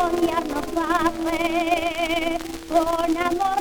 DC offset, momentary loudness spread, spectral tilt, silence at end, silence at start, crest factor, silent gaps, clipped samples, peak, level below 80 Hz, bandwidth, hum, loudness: under 0.1%; 4 LU; -4 dB/octave; 0 s; 0 s; 14 dB; none; under 0.1%; -8 dBFS; -42 dBFS; over 20 kHz; none; -23 LUFS